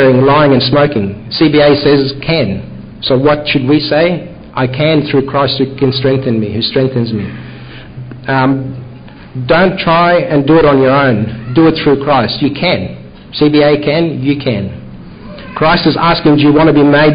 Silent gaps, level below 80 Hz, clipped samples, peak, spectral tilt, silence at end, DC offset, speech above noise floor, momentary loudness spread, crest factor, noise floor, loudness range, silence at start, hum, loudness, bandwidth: none; -36 dBFS; under 0.1%; 0 dBFS; -11.5 dB/octave; 0 s; under 0.1%; 21 dB; 17 LU; 10 dB; -31 dBFS; 5 LU; 0 s; none; -10 LUFS; 5.2 kHz